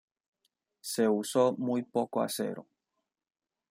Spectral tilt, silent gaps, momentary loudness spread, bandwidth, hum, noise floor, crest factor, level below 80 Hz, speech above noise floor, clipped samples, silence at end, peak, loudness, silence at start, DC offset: -5 dB/octave; none; 10 LU; 16.5 kHz; none; -85 dBFS; 20 dB; -82 dBFS; 55 dB; under 0.1%; 1.1 s; -14 dBFS; -30 LUFS; 0.85 s; under 0.1%